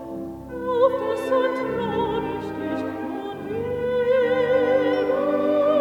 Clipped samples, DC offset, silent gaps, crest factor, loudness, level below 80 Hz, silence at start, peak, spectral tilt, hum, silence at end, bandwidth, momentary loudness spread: under 0.1%; under 0.1%; none; 16 dB; -23 LUFS; -52 dBFS; 0 s; -6 dBFS; -7 dB/octave; none; 0 s; 12 kHz; 10 LU